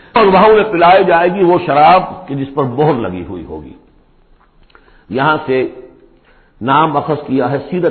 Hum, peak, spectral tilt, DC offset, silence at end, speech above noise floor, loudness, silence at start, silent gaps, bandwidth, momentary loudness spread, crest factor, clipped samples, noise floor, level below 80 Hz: none; 0 dBFS; -12 dB/octave; under 0.1%; 0 s; 37 dB; -12 LUFS; 0.15 s; none; 4.5 kHz; 15 LU; 12 dB; under 0.1%; -48 dBFS; -44 dBFS